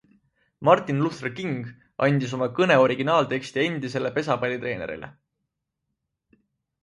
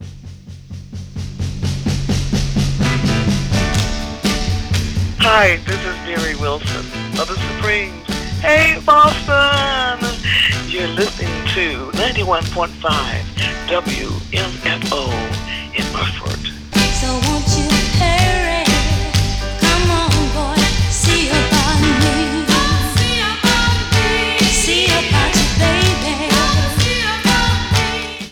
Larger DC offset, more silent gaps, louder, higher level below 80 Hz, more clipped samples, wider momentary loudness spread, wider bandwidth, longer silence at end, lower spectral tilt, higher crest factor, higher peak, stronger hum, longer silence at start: neither; neither; second, -24 LUFS vs -15 LUFS; second, -64 dBFS vs -26 dBFS; neither; first, 13 LU vs 9 LU; second, 11 kHz vs 18 kHz; first, 1.7 s vs 0 s; first, -6.5 dB/octave vs -4 dB/octave; first, 22 dB vs 14 dB; about the same, -4 dBFS vs -2 dBFS; neither; first, 0.6 s vs 0 s